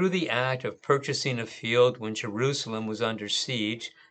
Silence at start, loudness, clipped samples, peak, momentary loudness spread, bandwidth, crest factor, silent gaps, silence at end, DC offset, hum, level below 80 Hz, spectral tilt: 0 s; -28 LUFS; under 0.1%; -8 dBFS; 9 LU; 9.2 kHz; 20 dB; none; 0.2 s; under 0.1%; none; -76 dBFS; -4.5 dB/octave